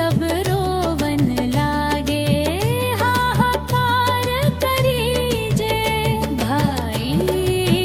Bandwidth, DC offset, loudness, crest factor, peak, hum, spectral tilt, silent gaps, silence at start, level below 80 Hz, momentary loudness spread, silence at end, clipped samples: 17.5 kHz; under 0.1%; -19 LUFS; 16 dB; -2 dBFS; none; -5.5 dB/octave; none; 0 s; -34 dBFS; 3 LU; 0 s; under 0.1%